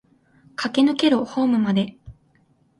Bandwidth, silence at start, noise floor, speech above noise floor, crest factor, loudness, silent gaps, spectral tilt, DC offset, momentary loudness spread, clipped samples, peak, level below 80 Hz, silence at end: 11.5 kHz; 0.6 s; -61 dBFS; 41 dB; 18 dB; -21 LUFS; none; -6 dB/octave; under 0.1%; 12 LU; under 0.1%; -6 dBFS; -58 dBFS; 0.7 s